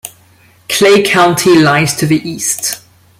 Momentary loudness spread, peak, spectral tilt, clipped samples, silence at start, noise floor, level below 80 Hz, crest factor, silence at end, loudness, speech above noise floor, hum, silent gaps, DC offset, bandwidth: 10 LU; 0 dBFS; -4 dB/octave; under 0.1%; 0.05 s; -46 dBFS; -48 dBFS; 12 dB; 0.4 s; -10 LUFS; 36 dB; none; none; under 0.1%; 16.5 kHz